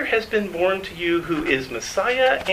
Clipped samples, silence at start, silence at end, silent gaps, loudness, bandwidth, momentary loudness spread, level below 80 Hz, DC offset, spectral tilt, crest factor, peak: under 0.1%; 0 s; 0 s; none; -22 LUFS; 15.5 kHz; 5 LU; -48 dBFS; under 0.1%; -4 dB/octave; 18 dB; -4 dBFS